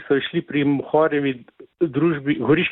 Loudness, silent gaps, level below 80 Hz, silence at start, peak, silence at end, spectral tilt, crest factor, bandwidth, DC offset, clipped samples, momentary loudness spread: -21 LUFS; none; -58 dBFS; 0 s; -4 dBFS; 0 s; -10.5 dB/octave; 16 dB; 4.1 kHz; under 0.1%; under 0.1%; 7 LU